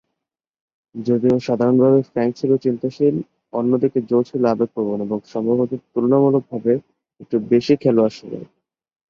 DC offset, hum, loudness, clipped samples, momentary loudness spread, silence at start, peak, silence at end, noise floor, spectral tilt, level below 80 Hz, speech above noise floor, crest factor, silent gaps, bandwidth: under 0.1%; none; -19 LUFS; under 0.1%; 9 LU; 0.95 s; -2 dBFS; 0.65 s; -83 dBFS; -8.5 dB/octave; -60 dBFS; 65 dB; 16 dB; none; 7 kHz